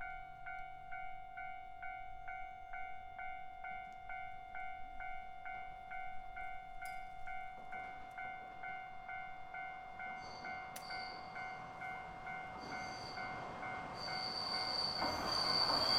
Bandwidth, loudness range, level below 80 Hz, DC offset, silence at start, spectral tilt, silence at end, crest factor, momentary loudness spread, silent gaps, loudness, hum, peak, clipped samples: 16 kHz; 8 LU; -62 dBFS; under 0.1%; 0 s; -2.5 dB/octave; 0 s; 22 dB; 12 LU; none; -44 LUFS; none; -22 dBFS; under 0.1%